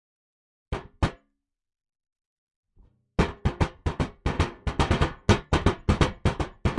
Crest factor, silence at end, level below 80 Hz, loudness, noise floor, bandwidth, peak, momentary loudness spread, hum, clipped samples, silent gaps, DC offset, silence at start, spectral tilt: 20 dB; 0 s; -34 dBFS; -27 LUFS; -77 dBFS; 11.5 kHz; -8 dBFS; 7 LU; none; under 0.1%; 2.26-2.47 s, 2.56-2.63 s; under 0.1%; 0.7 s; -6 dB/octave